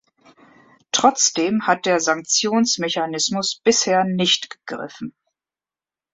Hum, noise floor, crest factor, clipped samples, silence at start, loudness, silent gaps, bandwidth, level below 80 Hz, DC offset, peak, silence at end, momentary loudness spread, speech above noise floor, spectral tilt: none; under -90 dBFS; 20 dB; under 0.1%; 0.95 s; -18 LUFS; none; 8.4 kHz; -66 dBFS; under 0.1%; -2 dBFS; 1.05 s; 15 LU; over 70 dB; -2.5 dB/octave